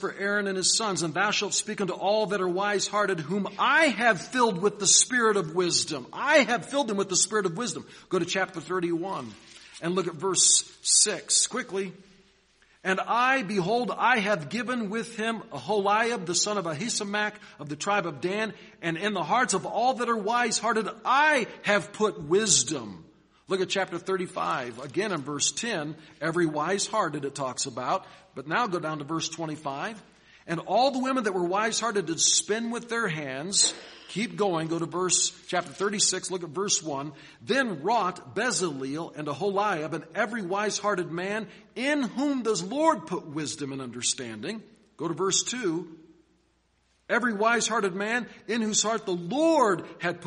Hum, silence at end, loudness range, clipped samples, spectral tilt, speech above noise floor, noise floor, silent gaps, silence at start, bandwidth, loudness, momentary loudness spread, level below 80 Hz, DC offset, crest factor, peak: none; 0 s; 6 LU; under 0.1%; -2.5 dB/octave; 41 dB; -69 dBFS; none; 0 s; 10.5 kHz; -26 LUFS; 12 LU; -70 dBFS; under 0.1%; 22 dB; -6 dBFS